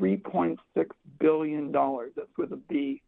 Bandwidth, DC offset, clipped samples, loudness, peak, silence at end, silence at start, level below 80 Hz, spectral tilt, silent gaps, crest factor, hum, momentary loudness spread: 4 kHz; under 0.1%; under 0.1%; -29 LUFS; -12 dBFS; 0.1 s; 0 s; -70 dBFS; -10.5 dB/octave; none; 16 dB; none; 9 LU